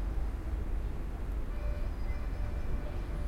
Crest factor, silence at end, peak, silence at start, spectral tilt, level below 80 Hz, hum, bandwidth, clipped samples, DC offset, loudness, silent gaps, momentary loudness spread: 10 dB; 0 s; -24 dBFS; 0 s; -7.5 dB/octave; -34 dBFS; none; 10.5 kHz; under 0.1%; under 0.1%; -39 LUFS; none; 2 LU